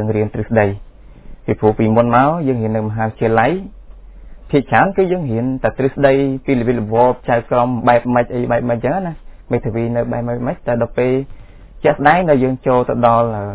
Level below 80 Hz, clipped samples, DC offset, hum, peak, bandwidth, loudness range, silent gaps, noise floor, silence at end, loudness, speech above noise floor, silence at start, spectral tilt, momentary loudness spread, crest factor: -38 dBFS; under 0.1%; under 0.1%; none; 0 dBFS; 4 kHz; 3 LU; none; -36 dBFS; 0 s; -16 LUFS; 21 dB; 0 s; -11.5 dB/octave; 8 LU; 16 dB